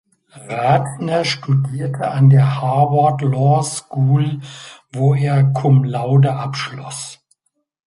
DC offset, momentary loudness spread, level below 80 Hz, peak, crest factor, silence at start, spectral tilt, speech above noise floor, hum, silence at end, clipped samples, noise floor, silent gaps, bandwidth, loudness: under 0.1%; 14 LU; -56 dBFS; -2 dBFS; 14 dB; 0.35 s; -6.5 dB/octave; 48 dB; none; 0.75 s; under 0.1%; -63 dBFS; none; 11.5 kHz; -16 LUFS